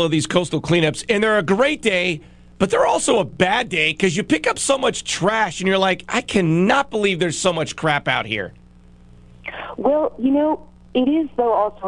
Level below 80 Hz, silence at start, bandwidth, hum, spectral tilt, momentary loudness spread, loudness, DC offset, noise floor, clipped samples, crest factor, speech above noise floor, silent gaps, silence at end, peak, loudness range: -48 dBFS; 0 s; 12 kHz; 60 Hz at -45 dBFS; -4.5 dB/octave; 6 LU; -19 LUFS; under 0.1%; -46 dBFS; under 0.1%; 18 dB; 28 dB; none; 0 s; 0 dBFS; 4 LU